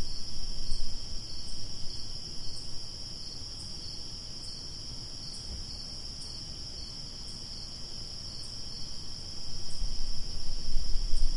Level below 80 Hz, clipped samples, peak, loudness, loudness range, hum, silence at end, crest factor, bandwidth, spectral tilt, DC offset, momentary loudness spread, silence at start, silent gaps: -36 dBFS; under 0.1%; -12 dBFS; -39 LUFS; 1 LU; none; 0 s; 16 dB; 11 kHz; -3 dB/octave; under 0.1%; 2 LU; 0 s; none